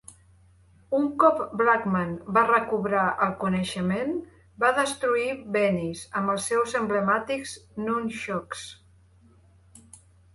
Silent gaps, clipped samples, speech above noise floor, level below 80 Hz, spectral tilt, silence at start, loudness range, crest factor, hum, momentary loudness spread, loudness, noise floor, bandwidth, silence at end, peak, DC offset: none; under 0.1%; 32 dB; -58 dBFS; -5 dB/octave; 0.1 s; 6 LU; 20 dB; none; 10 LU; -25 LUFS; -57 dBFS; 11.5 kHz; 1.6 s; -6 dBFS; under 0.1%